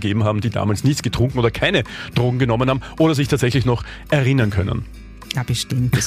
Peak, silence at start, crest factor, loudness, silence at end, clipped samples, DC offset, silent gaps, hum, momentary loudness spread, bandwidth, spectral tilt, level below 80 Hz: -4 dBFS; 0 s; 14 dB; -19 LUFS; 0 s; under 0.1%; under 0.1%; none; none; 7 LU; 15.5 kHz; -5.5 dB/octave; -38 dBFS